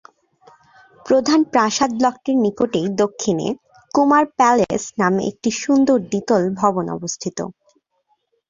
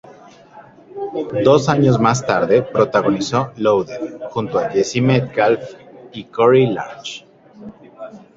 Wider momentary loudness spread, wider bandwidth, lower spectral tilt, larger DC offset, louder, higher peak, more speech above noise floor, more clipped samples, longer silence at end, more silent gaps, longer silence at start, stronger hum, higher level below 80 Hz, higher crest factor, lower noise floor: second, 10 LU vs 21 LU; about the same, 7.6 kHz vs 7.8 kHz; about the same, -5 dB/octave vs -6 dB/octave; neither; about the same, -18 LUFS vs -17 LUFS; about the same, -2 dBFS vs 0 dBFS; first, 49 dB vs 27 dB; neither; first, 1 s vs 0.2 s; neither; first, 1.05 s vs 0.55 s; neither; about the same, -58 dBFS vs -54 dBFS; about the same, 16 dB vs 18 dB; first, -67 dBFS vs -43 dBFS